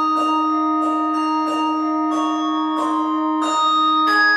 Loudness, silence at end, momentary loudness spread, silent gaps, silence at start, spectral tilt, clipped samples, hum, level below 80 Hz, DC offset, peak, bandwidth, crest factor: -18 LUFS; 0 s; 5 LU; none; 0 s; -2 dB/octave; under 0.1%; none; -76 dBFS; under 0.1%; -6 dBFS; 11 kHz; 12 dB